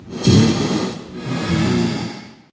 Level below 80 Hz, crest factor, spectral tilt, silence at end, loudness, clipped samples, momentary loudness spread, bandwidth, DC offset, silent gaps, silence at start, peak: -38 dBFS; 18 dB; -6 dB/octave; 0.2 s; -18 LUFS; under 0.1%; 16 LU; 8 kHz; under 0.1%; none; 0 s; 0 dBFS